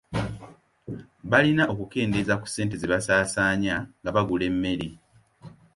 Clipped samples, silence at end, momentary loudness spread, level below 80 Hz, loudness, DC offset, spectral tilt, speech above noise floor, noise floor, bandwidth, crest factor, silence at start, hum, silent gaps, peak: under 0.1%; 0.25 s; 17 LU; -50 dBFS; -25 LUFS; under 0.1%; -5 dB/octave; 25 dB; -49 dBFS; 11.5 kHz; 22 dB; 0.1 s; none; none; -4 dBFS